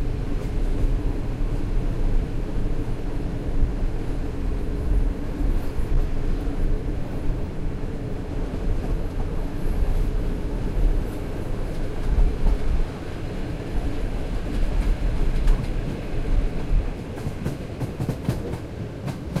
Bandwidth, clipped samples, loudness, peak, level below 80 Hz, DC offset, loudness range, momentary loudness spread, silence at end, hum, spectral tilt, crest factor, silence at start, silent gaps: 11 kHz; under 0.1%; -29 LUFS; -8 dBFS; -24 dBFS; under 0.1%; 2 LU; 5 LU; 0 s; none; -7.5 dB/octave; 16 dB; 0 s; none